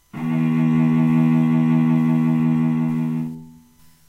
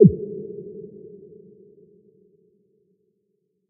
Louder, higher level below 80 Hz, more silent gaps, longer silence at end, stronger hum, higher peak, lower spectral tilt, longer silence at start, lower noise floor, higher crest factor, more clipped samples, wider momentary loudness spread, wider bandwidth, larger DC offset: first, -18 LUFS vs -25 LUFS; about the same, -58 dBFS vs -54 dBFS; neither; second, 0.55 s vs 2.9 s; neither; second, -8 dBFS vs 0 dBFS; first, -9.5 dB/octave vs -1.5 dB/octave; first, 0.15 s vs 0 s; second, -51 dBFS vs -73 dBFS; second, 10 dB vs 24 dB; neither; second, 8 LU vs 21 LU; first, 4.1 kHz vs 0.8 kHz; neither